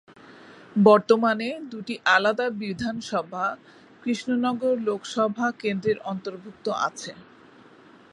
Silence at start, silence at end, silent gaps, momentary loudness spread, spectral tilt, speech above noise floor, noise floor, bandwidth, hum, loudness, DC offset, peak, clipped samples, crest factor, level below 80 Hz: 0.3 s; 0.9 s; none; 15 LU; -5 dB/octave; 27 dB; -51 dBFS; 11.5 kHz; none; -24 LUFS; under 0.1%; -2 dBFS; under 0.1%; 22 dB; -66 dBFS